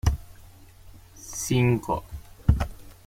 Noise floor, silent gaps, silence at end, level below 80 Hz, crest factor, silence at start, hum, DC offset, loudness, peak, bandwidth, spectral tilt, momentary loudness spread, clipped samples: -49 dBFS; none; 0.15 s; -34 dBFS; 24 dB; 0.05 s; none; under 0.1%; -27 LUFS; -4 dBFS; 16.5 kHz; -6 dB/octave; 15 LU; under 0.1%